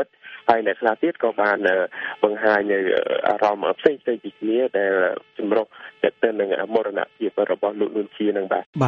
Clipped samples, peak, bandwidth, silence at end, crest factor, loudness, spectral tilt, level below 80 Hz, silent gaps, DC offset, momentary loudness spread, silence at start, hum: under 0.1%; 0 dBFS; 7.2 kHz; 0 s; 22 dB; -22 LUFS; -7 dB/octave; -68 dBFS; 8.66-8.73 s; under 0.1%; 6 LU; 0 s; none